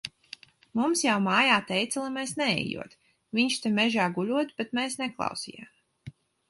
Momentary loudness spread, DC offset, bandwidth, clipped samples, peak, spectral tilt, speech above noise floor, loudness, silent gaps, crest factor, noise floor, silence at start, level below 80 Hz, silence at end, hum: 17 LU; under 0.1%; 12 kHz; under 0.1%; -8 dBFS; -3.5 dB/octave; 23 dB; -27 LUFS; none; 22 dB; -50 dBFS; 0.05 s; -68 dBFS; 0.4 s; none